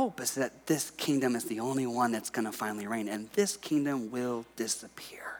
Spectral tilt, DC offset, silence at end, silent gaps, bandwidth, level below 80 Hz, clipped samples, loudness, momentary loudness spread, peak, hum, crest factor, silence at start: -4 dB/octave; under 0.1%; 0 s; none; over 20 kHz; -74 dBFS; under 0.1%; -32 LUFS; 6 LU; -14 dBFS; none; 18 dB; 0 s